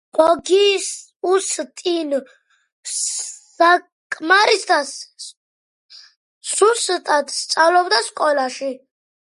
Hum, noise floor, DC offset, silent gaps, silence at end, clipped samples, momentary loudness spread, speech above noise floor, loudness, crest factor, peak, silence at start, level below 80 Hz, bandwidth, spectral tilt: none; under -90 dBFS; under 0.1%; 1.16-1.20 s, 2.72-2.83 s, 3.92-4.10 s, 5.37-5.89 s, 6.16-6.41 s; 0.6 s; under 0.1%; 16 LU; over 72 dB; -18 LUFS; 18 dB; 0 dBFS; 0.15 s; -70 dBFS; 11.5 kHz; 0.5 dB/octave